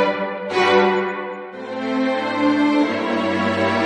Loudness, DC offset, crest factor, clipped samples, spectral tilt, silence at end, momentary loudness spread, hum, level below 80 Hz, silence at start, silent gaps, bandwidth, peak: -19 LUFS; under 0.1%; 16 dB; under 0.1%; -5.5 dB/octave; 0 s; 12 LU; none; -66 dBFS; 0 s; none; 10 kHz; -4 dBFS